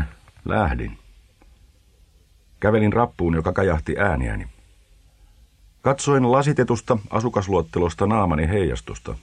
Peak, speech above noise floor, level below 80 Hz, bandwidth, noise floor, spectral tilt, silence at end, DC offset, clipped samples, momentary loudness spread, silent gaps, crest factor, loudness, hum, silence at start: -4 dBFS; 34 dB; -36 dBFS; 10.5 kHz; -55 dBFS; -6.5 dB/octave; 0.05 s; under 0.1%; under 0.1%; 12 LU; none; 20 dB; -21 LUFS; none; 0 s